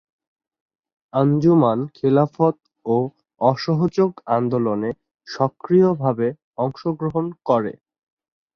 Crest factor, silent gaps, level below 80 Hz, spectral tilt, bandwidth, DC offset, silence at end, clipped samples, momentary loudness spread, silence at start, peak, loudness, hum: 18 dB; 5.14-5.18 s, 6.44-6.53 s; -60 dBFS; -9 dB/octave; 6.6 kHz; under 0.1%; 0.85 s; under 0.1%; 10 LU; 1.15 s; -2 dBFS; -20 LUFS; none